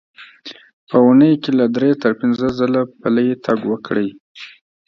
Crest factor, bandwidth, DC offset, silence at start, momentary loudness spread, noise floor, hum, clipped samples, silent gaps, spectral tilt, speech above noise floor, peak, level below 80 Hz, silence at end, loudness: 16 dB; 6.4 kHz; under 0.1%; 0.2 s; 24 LU; -39 dBFS; none; under 0.1%; 0.73-0.87 s, 4.20-4.35 s; -8 dB/octave; 23 dB; 0 dBFS; -54 dBFS; 0.4 s; -16 LUFS